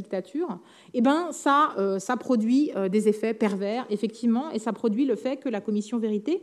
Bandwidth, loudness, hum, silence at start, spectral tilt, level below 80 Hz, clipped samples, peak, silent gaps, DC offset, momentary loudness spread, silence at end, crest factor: 12.5 kHz; -26 LUFS; none; 0 s; -6 dB/octave; -84 dBFS; under 0.1%; -8 dBFS; none; under 0.1%; 8 LU; 0 s; 16 dB